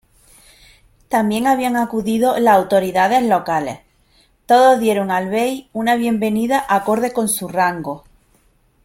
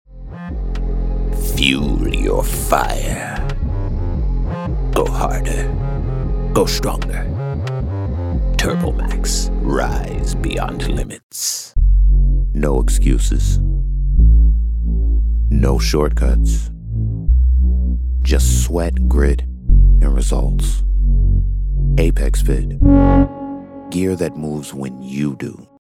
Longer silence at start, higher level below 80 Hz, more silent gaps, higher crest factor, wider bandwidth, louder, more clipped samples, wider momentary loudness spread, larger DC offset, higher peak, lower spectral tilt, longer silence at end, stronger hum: first, 1.1 s vs 0.1 s; second, -54 dBFS vs -16 dBFS; second, none vs 11.23-11.30 s; about the same, 16 dB vs 14 dB; about the same, 16.5 kHz vs 15.5 kHz; about the same, -17 LUFS vs -18 LUFS; neither; about the same, 9 LU vs 8 LU; neither; about the same, -2 dBFS vs 0 dBFS; about the same, -4.5 dB/octave vs -5.5 dB/octave; first, 0.85 s vs 0.35 s; neither